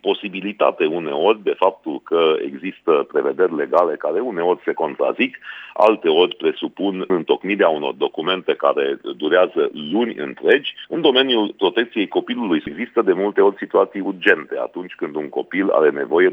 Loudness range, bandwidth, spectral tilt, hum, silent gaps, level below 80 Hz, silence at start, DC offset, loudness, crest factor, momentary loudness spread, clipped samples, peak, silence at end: 1 LU; 5.2 kHz; -7 dB/octave; none; none; -68 dBFS; 0.05 s; under 0.1%; -19 LUFS; 18 dB; 8 LU; under 0.1%; -2 dBFS; 0 s